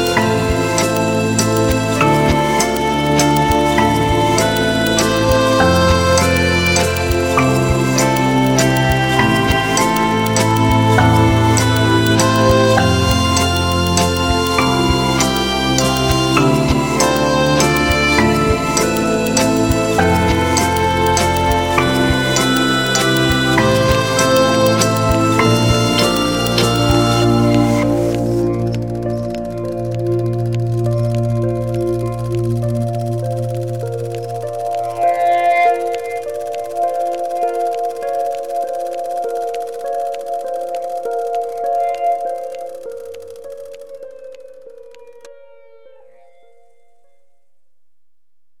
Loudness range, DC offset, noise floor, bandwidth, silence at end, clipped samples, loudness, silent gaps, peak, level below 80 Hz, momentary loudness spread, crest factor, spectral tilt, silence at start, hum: 8 LU; 0.8%; -70 dBFS; 19 kHz; 3.3 s; under 0.1%; -15 LUFS; none; -2 dBFS; -32 dBFS; 10 LU; 14 dB; -4.5 dB/octave; 0 s; none